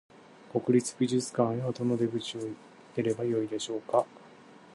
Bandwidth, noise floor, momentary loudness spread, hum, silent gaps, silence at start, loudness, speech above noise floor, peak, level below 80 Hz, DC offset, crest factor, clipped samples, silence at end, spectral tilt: 11.5 kHz; -53 dBFS; 12 LU; none; none; 0.45 s; -30 LUFS; 24 dB; -10 dBFS; -74 dBFS; under 0.1%; 20 dB; under 0.1%; 0.05 s; -6 dB/octave